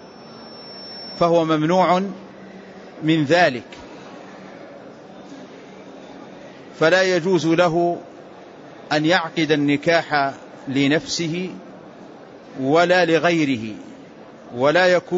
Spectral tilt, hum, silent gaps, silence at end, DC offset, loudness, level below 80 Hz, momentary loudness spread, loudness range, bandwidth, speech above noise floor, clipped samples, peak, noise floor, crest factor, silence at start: -5 dB/octave; none; none; 0 s; under 0.1%; -19 LUFS; -62 dBFS; 24 LU; 4 LU; 8 kHz; 23 dB; under 0.1%; -4 dBFS; -41 dBFS; 16 dB; 0 s